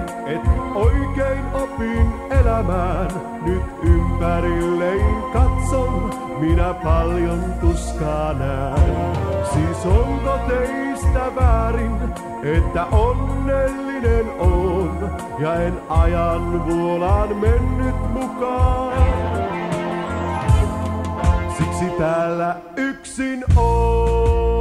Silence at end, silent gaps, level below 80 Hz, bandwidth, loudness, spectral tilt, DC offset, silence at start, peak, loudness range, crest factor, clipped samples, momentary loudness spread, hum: 0 s; none; -22 dBFS; 12 kHz; -20 LUFS; -7.5 dB/octave; under 0.1%; 0 s; -2 dBFS; 1 LU; 16 dB; under 0.1%; 6 LU; none